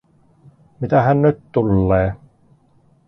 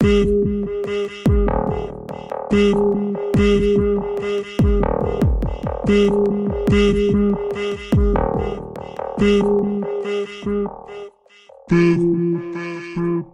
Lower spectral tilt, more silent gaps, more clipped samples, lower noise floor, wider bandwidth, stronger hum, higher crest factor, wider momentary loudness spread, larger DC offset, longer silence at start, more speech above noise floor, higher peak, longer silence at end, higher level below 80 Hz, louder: first, -11 dB/octave vs -7.5 dB/octave; neither; neither; first, -55 dBFS vs -48 dBFS; second, 5.8 kHz vs 10.5 kHz; neither; about the same, 18 dB vs 14 dB; about the same, 11 LU vs 12 LU; neither; first, 0.8 s vs 0 s; first, 39 dB vs 32 dB; about the same, -2 dBFS vs -4 dBFS; first, 0.9 s vs 0.05 s; second, -38 dBFS vs -28 dBFS; about the same, -17 LUFS vs -19 LUFS